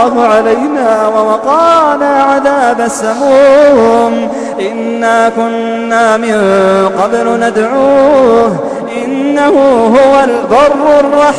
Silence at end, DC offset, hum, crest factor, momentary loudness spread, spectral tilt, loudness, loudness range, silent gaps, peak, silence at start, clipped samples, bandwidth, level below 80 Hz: 0 s; under 0.1%; none; 8 dB; 8 LU; -5 dB/octave; -8 LUFS; 2 LU; none; 0 dBFS; 0 s; 0.5%; 11 kHz; -44 dBFS